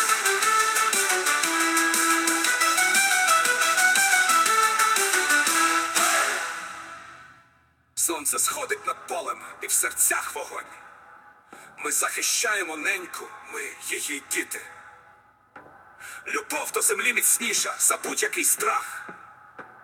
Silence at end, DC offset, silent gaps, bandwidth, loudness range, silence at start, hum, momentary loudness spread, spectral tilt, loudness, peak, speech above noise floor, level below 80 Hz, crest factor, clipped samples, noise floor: 0.15 s; under 0.1%; none; 18 kHz; 9 LU; 0 s; none; 16 LU; 1 dB/octave; -22 LUFS; -6 dBFS; 35 dB; -74 dBFS; 18 dB; under 0.1%; -62 dBFS